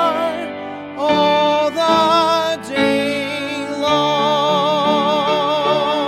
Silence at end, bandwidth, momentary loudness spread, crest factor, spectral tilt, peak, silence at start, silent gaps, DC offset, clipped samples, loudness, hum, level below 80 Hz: 0 s; 15.5 kHz; 8 LU; 14 dB; -4.5 dB/octave; -2 dBFS; 0 s; none; under 0.1%; under 0.1%; -16 LUFS; none; -58 dBFS